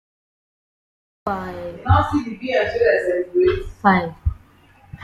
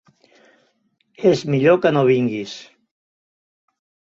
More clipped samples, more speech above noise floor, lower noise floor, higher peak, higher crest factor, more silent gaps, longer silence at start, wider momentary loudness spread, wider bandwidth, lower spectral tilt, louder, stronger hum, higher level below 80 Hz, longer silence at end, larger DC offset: neither; second, 32 dB vs 49 dB; second, -51 dBFS vs -66 dBFS; about the same, -2 dBFS vs -2 dBFS; about the same, 18 dB vs 20 dB; neither; about the same, 1.25 s vs 1.2 s; second, 11 LU vs 15 LU; first, 10.5 kHz vs 7.6 kHz; about the same, -8 dB/octave vs -7 dB/octave; second, -20 LUFS vs -17 LUFS; neither; first, -36 dBFS vs -62 dBFS; second, 0 s vs 1.5 s; neither